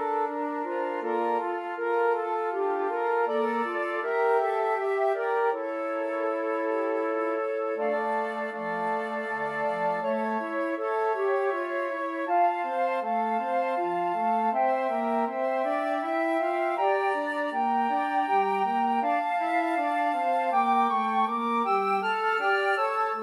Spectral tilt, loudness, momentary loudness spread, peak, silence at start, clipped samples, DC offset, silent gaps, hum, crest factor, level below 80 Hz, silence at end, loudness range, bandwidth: -5.5 dB/octave; -27 LUFS; 5 LU; -14 dBFS; 0 s; under 0.1%; under 0.1%; none; none; 14 dB; under -90 dBFS; 0 s; 3 LU; 12.5 kHz